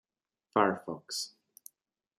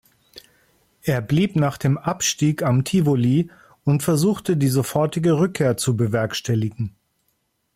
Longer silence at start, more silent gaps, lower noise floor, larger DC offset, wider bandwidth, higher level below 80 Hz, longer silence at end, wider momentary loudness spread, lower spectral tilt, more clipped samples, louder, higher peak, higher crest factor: first, 0.55 s vs 0.35 s; neither; first, -80 dBFS vs -70 dBFS; neither; about the same, 15.5 kHz vs 16 kHz; second, -80 dBFS vs -54 dBFS; about the same, 0.9 s vs 0.85 s; first, 13 LU vs 6 LU; second, -3.5 dB/octave vs -6 dB/octave; neither; second, -33 LUFS vs -21 LUFS; about the same, -10 dBFS vs -8 dBFS; first, 26 dB vs 14 dB